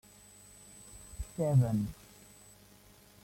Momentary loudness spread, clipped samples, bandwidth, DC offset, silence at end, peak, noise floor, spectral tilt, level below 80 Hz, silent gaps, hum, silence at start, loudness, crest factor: 27 LU; under 0.1%; 16.5 kHz; under 0.1%; 1.3 s; -16 dBFS; -59 dBFS; -8 dB/octave; -54 dBFS; none; 50 Hz at -55 dBFS; 0.8 s; -32 LUFS; 20 dB